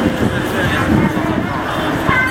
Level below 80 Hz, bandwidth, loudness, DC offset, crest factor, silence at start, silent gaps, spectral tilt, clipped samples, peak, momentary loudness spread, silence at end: -32 dBFS; 16.5 kHz; -16 LUFS; under 0.1%; 16 dB; 0 s; none; -6 dB/octave; under 0.1%; 0 dBFS; 4 LU; 0 s